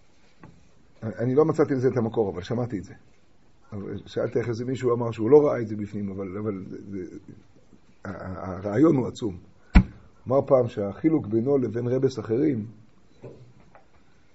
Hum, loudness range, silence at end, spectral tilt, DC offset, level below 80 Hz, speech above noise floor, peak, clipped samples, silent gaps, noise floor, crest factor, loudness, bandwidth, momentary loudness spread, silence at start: none; 5 LU; 0.9 s; -8 dB/octave; 0.2%; -38 dBFS; 35 dB; 0 dBFS; under 0.1%; none; -60 dBFS; 26 dB; -25 LUFS; 8 kHz; 17 LU; 0.45 s